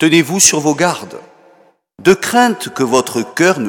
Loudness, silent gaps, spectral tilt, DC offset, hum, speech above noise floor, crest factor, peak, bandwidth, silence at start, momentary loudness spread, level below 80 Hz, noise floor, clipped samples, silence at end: -13 LUFS; none; -3 dB/octave; under 0.1%; none; 37 dB; 14 dB; 0 dBFS; 19.5 kHz; 0 s; 10 LU; -54 dBFS; -50 dBFS; under 0.1%; 0 s